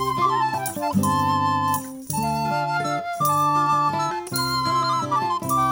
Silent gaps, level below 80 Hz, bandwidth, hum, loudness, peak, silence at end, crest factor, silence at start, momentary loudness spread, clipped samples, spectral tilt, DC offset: none; -52 dBFS; over 20 kHz; none; -22 LUFS; -8 dBFS; 0 s; 14 dB; 0 s; 6 LU; under 0.1%; -4.5 dB/octave; under 0.1%